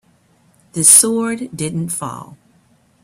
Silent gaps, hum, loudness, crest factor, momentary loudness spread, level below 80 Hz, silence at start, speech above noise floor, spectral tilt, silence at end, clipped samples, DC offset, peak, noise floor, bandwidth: none; none; -13 LUFS; 18 dB; 21 LU; -58 dBFS; 0.75 s; 39 dB; -3 dB/octave; 0.7 s; 0.1%; under 0.1%; 0 dBFS; -55 dBFS; 16 kHz